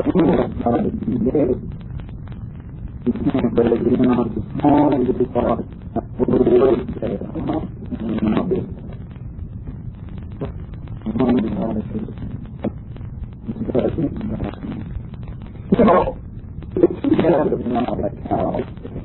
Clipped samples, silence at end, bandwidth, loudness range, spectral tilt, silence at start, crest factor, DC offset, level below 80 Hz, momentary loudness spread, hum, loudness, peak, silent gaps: under 0.1%; 0 s; 4.2 kHz; 7 LU; -12.5 dB/octave; 0 s; 20 dB; under 0.1%; -36 dBFS; 18 LU; none; -20 LUFS; 0 dBFS; none